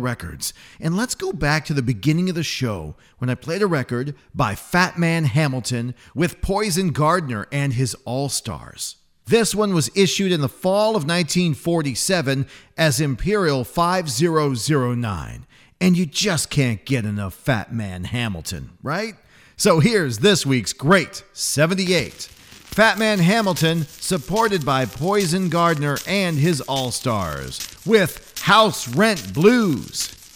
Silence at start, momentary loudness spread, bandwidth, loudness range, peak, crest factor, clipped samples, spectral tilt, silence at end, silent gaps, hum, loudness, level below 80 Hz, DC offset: 0 s; 11 LU; 17.5 kHz; 4 LU; -2 dBFS; 18 dB; under 0.1%; -4.5 dB/octave; 0.1 s; none; none; -20 LUFS; -44 dBFS; under 0.1%